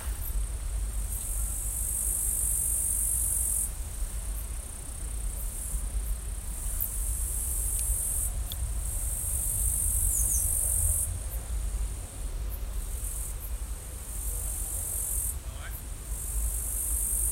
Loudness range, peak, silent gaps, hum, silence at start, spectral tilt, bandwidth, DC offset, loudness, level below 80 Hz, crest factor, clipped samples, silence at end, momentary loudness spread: 8 LU; -12 dBFS; none; none; 0 s; -2.5 dB/octave; 16 kHz; under 0.1%; -30 LUFS; -34 dBFS; 18 dB; under 0.1%; 0 s; 13 LU